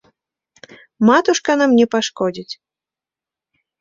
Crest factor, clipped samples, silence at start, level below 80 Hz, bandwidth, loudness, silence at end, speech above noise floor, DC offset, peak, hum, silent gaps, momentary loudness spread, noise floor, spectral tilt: 18 dB; under 0.1%; 1 s; -62 dBFS; 7.6 kHz; -16 LUFS; 1.25 s; 74 dB; under 0.1%; -2 dBFS; none; none; 18 LU; -89 dBFS; -4 dB/octave